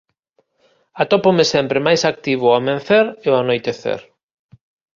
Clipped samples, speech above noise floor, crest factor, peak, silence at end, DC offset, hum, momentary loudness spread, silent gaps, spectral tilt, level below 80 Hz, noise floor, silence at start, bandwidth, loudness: under 0.1%; 49 dB; 16 dB; -2 dBFS; 0.95 s; under 0.1%; none; 9 LU; none; -4.5 dB/octave; -58 dBFS; -64 dBFS; 0.95 s; 7.4 kHz; -16 LUFS